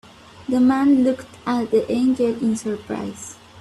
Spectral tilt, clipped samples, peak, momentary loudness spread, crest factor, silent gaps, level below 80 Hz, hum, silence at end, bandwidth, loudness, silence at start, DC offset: -6 dB/octave; under 0.1%; -8 dBFS; 15 LU; 14 dB; none; -58 dBFS; none; 0 s; 12 kHz; -20 LUFS; 0.35 s; under 0.1%